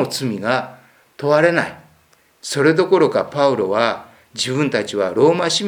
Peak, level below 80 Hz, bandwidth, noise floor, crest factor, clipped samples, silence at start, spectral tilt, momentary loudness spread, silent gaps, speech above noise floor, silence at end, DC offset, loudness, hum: 0 dBFS; -64 dBFS; 19.5 kHz; -56 dBFS; 18 dB; under 0.1%; 0 s; -4.5 dB/octave; 12 LU; none; 39 dB; 0 s; under 0.1%; -17 LUFS; none